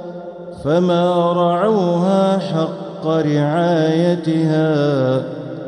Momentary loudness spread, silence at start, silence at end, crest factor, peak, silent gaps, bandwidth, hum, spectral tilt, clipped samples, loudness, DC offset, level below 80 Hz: 9 LU; 0 s; 0 s; 12 dB; -4 dBFS; none; 9.8 kHz; none; -8 dB/octave; under 0.1%; -17 LUFS; under 0.1%; -58 dBFS